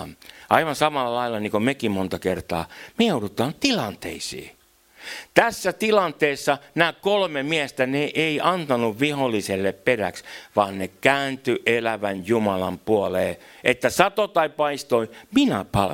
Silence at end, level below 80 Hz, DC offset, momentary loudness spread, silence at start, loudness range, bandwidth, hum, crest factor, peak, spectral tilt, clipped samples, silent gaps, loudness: 0 s; -56 dBFS; under 0.1%; 8 LU; 0 s; 3 LU; 17 kHz; none; 22 dB; 0 dBFS; -4.5 dB/octave; under 0.1%; none; -23 LUFS